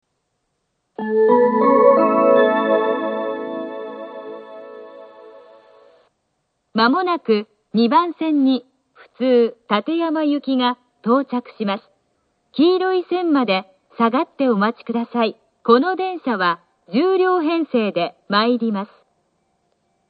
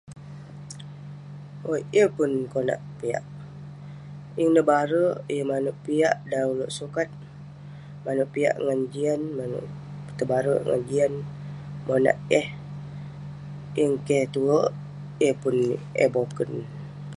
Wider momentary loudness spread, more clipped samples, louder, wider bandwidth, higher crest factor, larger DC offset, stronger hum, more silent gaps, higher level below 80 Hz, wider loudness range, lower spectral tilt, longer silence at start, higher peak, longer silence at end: second, 15 LU vs 19 LU; neither; first, -18 LUFS vs -25 LUFS; second, 5 kHz vs 11.5 kHz; about the same, 18 dB vs 20 dB; neither; second, none vs 50 Hz at -60 dBFS; neither; second, -74 dBFS vs -60 dBFS; first, 8 LU vs 3 LU; first, -9 dB/octave vs -6.5 dB/octave; first, 1 s vs 0.05 s; first, 0 dBFS vs -6 dBFS; first, 1.25 s vs 0 s